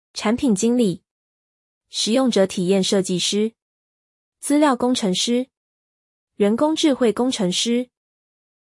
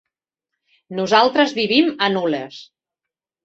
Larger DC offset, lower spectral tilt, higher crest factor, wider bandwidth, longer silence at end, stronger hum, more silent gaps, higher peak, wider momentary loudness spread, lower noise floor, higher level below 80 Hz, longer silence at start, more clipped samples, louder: neither; about the same, -4.5 dB/octave vs -4.5 dB/octave; about the same, 16 dB vs 20 dB; first, 12 kHz vs 8 kHz; about the same, 0.8 s vs 0.8 s; neither; first, 1.11-1.81 s, 3.62-4.32 s, 5.57-6.27 s vs none; second, -4 dBFS vs 0 dBFS; second, 7 LU vs 13 LU; first, under -90 dBFS vs -86 dBFS; about the same, -62 dBFS vs -64 dBFS; second, 0.15 s vs 0.9 s; neither; second, -20 LUFS vs -17 LUFS